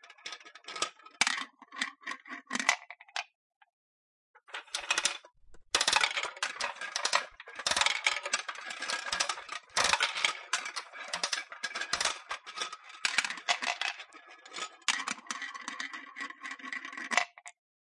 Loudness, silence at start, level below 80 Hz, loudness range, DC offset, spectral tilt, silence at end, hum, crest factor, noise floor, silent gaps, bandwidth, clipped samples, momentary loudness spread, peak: -32 LUFS; 0.05 s; -72 dBFS; 6 LU; under 0.1%; 1.5 dB/octave; 0.5 s; none; 26 dB; -54 dBFS; 3.35-3.50 s, 3.56-3.61 s, 3.73-4.34 s; 11.5 kHz; under 0.1%; 16 LU; -10 dBFS